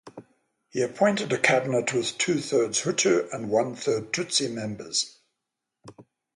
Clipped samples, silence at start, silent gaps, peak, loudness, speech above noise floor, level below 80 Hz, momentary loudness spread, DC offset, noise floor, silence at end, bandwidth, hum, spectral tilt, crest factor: under 0.1%; 0.05 s; none; -2 dBFS; -25 LUFS; 59 dB; -68 dBFS; 8 LU; under 0.1%; -84 dBFS; 0.35 s; 11.5 kHz; none; -3 dB/octave; 24 dB